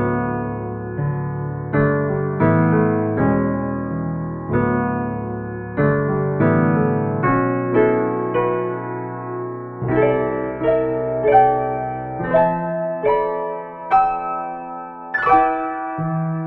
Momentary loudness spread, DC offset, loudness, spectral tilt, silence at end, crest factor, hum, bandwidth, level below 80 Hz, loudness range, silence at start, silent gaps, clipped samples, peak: 11 LU; under 0.1%; -20 LUFS; -11.5 dB/octave; 0 s; 18 dB; none; 4.2 kHz; -44 dBFS; 2 LU; 0 s; none; under 0.1%; -2 dBFS